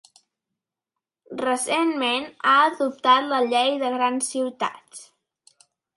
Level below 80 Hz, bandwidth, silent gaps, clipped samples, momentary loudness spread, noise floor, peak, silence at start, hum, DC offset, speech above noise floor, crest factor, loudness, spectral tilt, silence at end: -76 dBFS; 11.5 kHz; none; under 0.1%; 12 LU; -87 dBFS; -6 dBFS; 1.3 s; none; under 0.1%; 65 dB; 18 dB; -22 LUFS; -1.5 dB/octave; 0.95 s